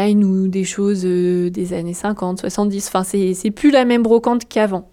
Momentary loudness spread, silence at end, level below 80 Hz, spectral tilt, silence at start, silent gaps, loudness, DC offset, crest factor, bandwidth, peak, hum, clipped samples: 8 LU; 0.1 s; -50 dBFS; -6 dB/octave; 0 s; none; -17 LUFS; under 0.1%; 14 dB; 15.5 kHz; -4 dBFS; none; under 0.1%